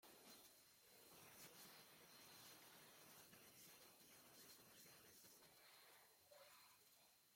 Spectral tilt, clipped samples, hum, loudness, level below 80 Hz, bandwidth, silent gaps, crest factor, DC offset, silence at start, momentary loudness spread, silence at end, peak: -1.5 dB/octave; under 0.1%; none; -65 LUFS; under -90 dBFS; 16.5 kHz; none; 18 dB; under 0.1%; 0 s; 5 LU; 0 s; -50 dBFS